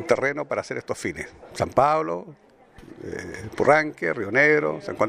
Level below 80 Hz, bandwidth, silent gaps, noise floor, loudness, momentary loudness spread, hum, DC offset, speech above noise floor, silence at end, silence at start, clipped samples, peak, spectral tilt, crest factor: -56 dBFS; 14.5 kHz; none; -47 dBFS; -23 LUFS; 17 LU; none; under 0.1%; 24 dB; 0 s; 0 s; under 0.1%; -2 dBFS; -5.5 dB/octave; 22 dB